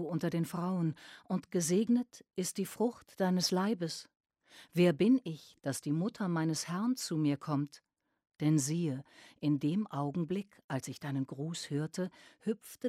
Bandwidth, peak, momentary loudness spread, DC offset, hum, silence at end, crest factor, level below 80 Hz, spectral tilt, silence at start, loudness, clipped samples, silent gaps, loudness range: 16 kHz; -16 dBFS; 10 LU; under 0.1%; none; 0 s; 18 dB; -76 dBFS; -5.5 dB/octave; 0 s; -34 LUFS; under 0.1%; 10.64-10.69 s; 4 LU